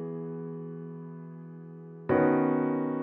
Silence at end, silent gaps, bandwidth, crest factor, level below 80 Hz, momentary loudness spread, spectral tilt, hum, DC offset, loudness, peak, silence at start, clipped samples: 0 s; none; 3.9 kHz; 18 dB; -68 dBFS; 20 LU; -9 dB/octave; none; under 0.1%; -29 LUFS; -12 dBFS; 0 s; under 0.1%